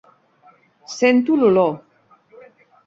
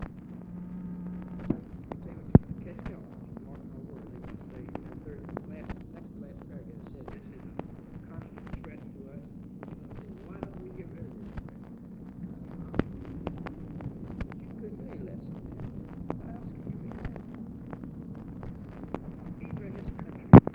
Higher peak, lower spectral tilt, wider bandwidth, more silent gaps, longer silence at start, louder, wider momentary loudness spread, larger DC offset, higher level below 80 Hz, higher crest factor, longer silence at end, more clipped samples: about the same, -2 dBFS vs 0 dBFS; second, -5.5 dB/octave vs -11 dB/octave; first, 7.8 kHz vs 4.9 kHz; neither; first, 0.9 s vs 0 s; first, -17 LUFS vs -34 LUFS; first, 18 LU vs 10 LU; neither; second, -64 dBFS vs -46 dBFS; second, 18 dB vs 32 dB; first, 1.1 s vs 0 s; neither